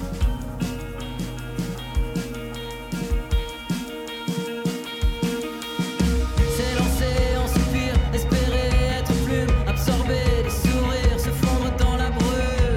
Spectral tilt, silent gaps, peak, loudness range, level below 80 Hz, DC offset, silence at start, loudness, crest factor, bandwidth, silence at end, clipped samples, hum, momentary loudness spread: -5.5 dB/octave; none; -6 dBFS; 7 LU; -26 dBFS; under 0.1%; 0 s; -24 LUFS; 16 dB; 16.5 kHz; 0 s; under 0.1%; none; 8 LU